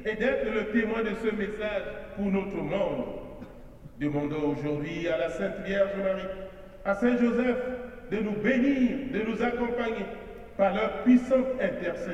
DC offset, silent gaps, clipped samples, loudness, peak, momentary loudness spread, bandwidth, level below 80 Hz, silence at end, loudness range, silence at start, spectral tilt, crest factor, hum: under 0.1%; none; under 0.1%; -28 LUFS; -12 dBFS; 13 LU; 8.2 kHz; -50 dBFS; 0 s; 5 LU; 0 s; -7.5 dB/octave; 16 dB; none